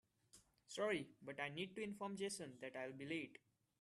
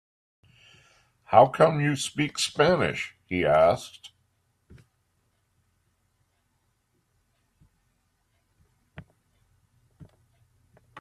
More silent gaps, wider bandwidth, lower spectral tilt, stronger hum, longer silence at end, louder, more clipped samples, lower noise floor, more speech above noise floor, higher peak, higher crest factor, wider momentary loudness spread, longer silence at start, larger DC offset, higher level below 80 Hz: neither; about the same, 13 kHz vs 13.5 kHz; about the same, -4 dB/octave vs -5 dB/octave; neither; first, 0.45 s vs 0 s; second, -48 LUFS vs -23 LUFS; neither; about the same, -72 dBFS vs -72 dBFS; second, 25 dB vs 50 dB; second, -28 dBFS vs -2 dBFS; second, 20 dB vs 26 dB; about the same, 11 LU vs 12 LU; second, 0.35 s vs 1.3 s; neither; second, -86 dBFS vs -60 dBFS